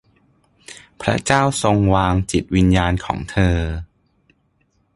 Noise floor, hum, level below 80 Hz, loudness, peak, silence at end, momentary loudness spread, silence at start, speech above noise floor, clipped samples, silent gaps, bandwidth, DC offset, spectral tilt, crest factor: -63 dBFS; none; -30 dBFS; -18 LUFS; 0 dBFS; 1.1 s; 14 LU; 0.7 s; 46 dB; under 0.1%; none; 11.5 kHz; under 0.1%; -5.5 dB/octave; 18 dB